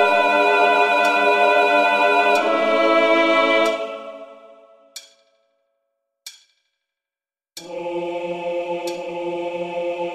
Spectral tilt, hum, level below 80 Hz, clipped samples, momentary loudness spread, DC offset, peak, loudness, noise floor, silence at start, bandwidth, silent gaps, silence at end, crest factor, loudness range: -3 dB/octave; none; -68 dBFS; under 0.1%; 19 LU; under 0.1%; -4 dBFS; -18 LUFS; under -90 dBFS; 0 s; 15 kHz; none; 0 s; 16 dB; 18 LU